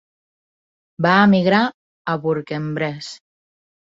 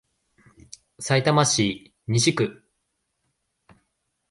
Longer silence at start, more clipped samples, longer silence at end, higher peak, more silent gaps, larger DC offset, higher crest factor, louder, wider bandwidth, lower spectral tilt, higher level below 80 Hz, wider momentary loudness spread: about the same, 1 s vs 1 s; neither; second, 0.8 s vs 1.8 s; about the same, -2 dBFS vs -4 dBFS; first, 1.74-2.05 s vs none; neither; about the same, 20 dB vs 22 dB; first, -18 LUFS vs -22 LUFS; second, 7.8 kHz vs 11.5 kHz; first, -6.5 dB/octave vs -4 dB/octave; about the same, -62 dBFS vs -60 dBFS; first, 16 LU vs 11 LU